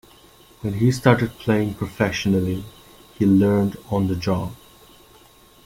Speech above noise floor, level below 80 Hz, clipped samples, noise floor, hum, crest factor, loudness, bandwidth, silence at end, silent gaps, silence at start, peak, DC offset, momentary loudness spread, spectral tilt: 31 dB; -48 dBFS; under 0.1%; -51 dBFS; none; 20 dB; -21 LUFS; 16.5 kHz; 1.1 s; none; 0.65 s; -2 dBFS; under 0.1%; 12 LU; -7 dB/octave